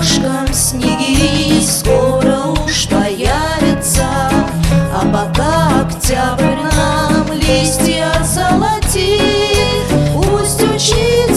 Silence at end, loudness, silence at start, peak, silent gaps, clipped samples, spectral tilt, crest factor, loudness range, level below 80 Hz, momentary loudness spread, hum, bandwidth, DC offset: 0 s; -13 LUFS; 0 s; 0 dBFS; none; under 0.1%; -4.5 dB/octave; 12 dB; 1 LU; -22 dBFS; 3 LU; none; 15.5 kHz; 0.2%